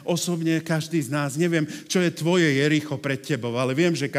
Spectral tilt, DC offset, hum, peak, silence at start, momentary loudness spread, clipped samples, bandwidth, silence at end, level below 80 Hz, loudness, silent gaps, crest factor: -5 dB/octave; under 0.1%; none; -8 dBFS; 0 s; 7 LU; under 0.1%; 16 kHz; 0 s; -76 dBFS; -23 LUFS; none; 16 dB